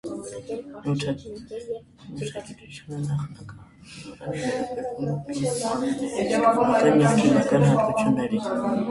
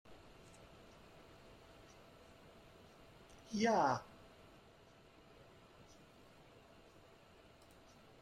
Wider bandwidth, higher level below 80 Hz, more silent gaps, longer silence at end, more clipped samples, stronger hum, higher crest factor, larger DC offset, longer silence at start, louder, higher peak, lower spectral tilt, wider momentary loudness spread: second, 11.5 kHz vs 15 kHz; first, -56 dBFS vs -72 dBFS; neither; second, 0 s vs 4.2 s; neither; neither; second, 18 dB vs 26 dB; neither; about the same, 0.05 s vs 0.1 s; first, -24 LUFS vs -37 LUFS; first, -6 dBFS vs -20 dBFS; first, -6.5 dB/octave vs -5 dB/octave; second, 19 LU vs 26 LU